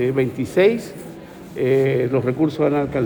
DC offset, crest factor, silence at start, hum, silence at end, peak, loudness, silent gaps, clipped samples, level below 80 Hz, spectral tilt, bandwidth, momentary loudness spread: under 0.1%; 14 dB; 0 s; none; 0 s; -4 dBFS; -19 LUFS; none; under 0.1%; -52 dBFS; -7.5 dB/octave; over 20 kHz; 18 LU